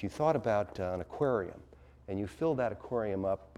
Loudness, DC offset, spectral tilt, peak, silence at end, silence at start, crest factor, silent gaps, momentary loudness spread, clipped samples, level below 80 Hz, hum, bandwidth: -33 LUFS; under 0.1%; -7.5 dB/octave; -16 dBFS; 0.1 s; 0 s; 18 dB; none; 11 LU; under 0.1%; -58 dBFS; none; 13 kHz